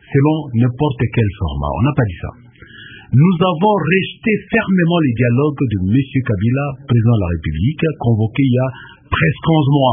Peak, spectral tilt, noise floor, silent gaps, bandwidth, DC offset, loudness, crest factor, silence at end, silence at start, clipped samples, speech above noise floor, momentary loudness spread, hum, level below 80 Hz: 0 dBFS; -13 dB/octave; -38 dBFS; none; 3.7 kHz; under 0.1%; -16 LUFS; 14 dB; 0 s; 0.1 s; under 0.1%; 23 dB; 7 LU; none; -34 dBFS